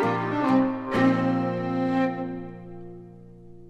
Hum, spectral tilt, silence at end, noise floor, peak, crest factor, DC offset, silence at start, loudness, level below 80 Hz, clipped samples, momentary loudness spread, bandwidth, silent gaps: none; -8 dB/octave; 0 s; -45 dBFS; -10 dBFS; 16 dB; under 0.1%; 0 s; -25 LUFS; -56 dBFS; under 0.1%; 20 LU; 7.8 kHz; none